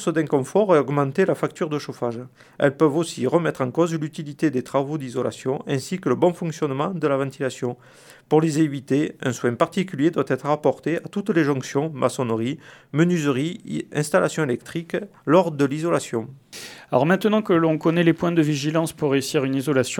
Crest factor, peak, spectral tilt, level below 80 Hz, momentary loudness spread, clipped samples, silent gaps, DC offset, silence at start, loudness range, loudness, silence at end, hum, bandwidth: 18 dB; -2 dBFS; -6 dB/octave; -66 dBFS; 10 LU; under 0.1%; none; under 0.1%; 0 s; 3 LU; -22 LUFS; 0 s; none; 17.5 kHz